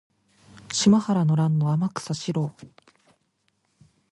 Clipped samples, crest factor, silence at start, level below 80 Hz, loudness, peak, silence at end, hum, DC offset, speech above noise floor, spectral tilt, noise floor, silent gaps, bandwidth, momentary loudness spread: under 0.1%; 18 dB; 0.7 s; -64 dBFS; -23 LUFS; -6 dBFS; 1.45 s; none; under 0.1%; 49 dB; -6 dB/octave; -71 dBFS; none; 11.5 kHz; 10 LU